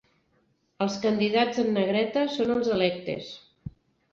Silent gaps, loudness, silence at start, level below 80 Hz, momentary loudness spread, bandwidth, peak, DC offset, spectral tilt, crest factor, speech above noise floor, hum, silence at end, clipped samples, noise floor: none; -26 LUFS; 0.8 s; -60 dBFS; 18 LU; 7.6 kHz; -10 dBFS; under 0.1%; -5.5 dB/octave; 18 dB; 44 dB; none; 0.45 s; under 0.1%; -69 dBFS